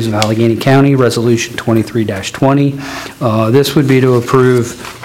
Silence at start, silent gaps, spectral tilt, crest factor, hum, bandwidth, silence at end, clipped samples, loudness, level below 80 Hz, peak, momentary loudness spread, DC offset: 0 s; none; -6 dB/octave; 12 dB; none; 16.5 kHz; 0 s; 0.6%; -11 LUFS; -46 dBFS; 0 dBFS; 7 LU; under 0.1%